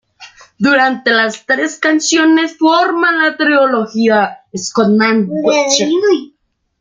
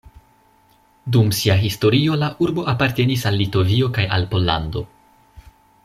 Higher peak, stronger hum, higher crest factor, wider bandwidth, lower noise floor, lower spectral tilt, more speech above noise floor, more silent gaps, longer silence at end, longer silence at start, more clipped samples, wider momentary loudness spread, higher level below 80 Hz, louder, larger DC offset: about the same, 0 dBFS vs -2 dBFS; neither; second, 12 dB vs 18 dB; second, 9.4 kHz vs 15 kHz; second, -40 dBFS vs -56 dBFS; second, -3.5 dB/octave vs -6 dB/octave; second, 28 dB vs 38 dB; neither; about the same, 0.55 s vs 0.45 s; second, 0.2 s vs 1.05 s; neither; about the same, 5 LU vs 6 LU; second, -60 dBFS vs -44 dBFS; first, -12 LUFS vs -19 LUFS; neither